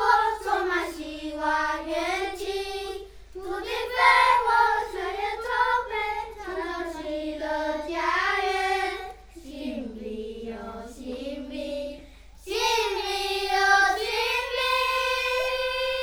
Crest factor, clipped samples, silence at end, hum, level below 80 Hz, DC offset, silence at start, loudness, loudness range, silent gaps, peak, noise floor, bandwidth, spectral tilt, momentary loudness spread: 20 dB; under 0.1%; 0 s; none; -50 dBFS; under 0.1%; 0 s; -25 LUFS; 8 LU; none; -6 dBFS; -47 dBFS; over 20 kHz; -2 dB/octave; 16 LU